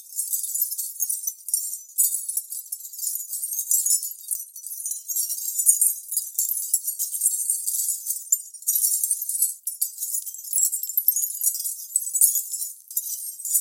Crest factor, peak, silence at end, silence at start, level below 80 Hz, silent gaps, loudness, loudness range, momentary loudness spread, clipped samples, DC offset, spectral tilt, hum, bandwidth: 26 dB; 0 dBFS; 0 s; 0 s; under -90 dBFS; none; -23 LUFS; 3 LU; 10 LU; under 0.1%; under 0.1%; 12.5 dB/octave; none; 17 kHz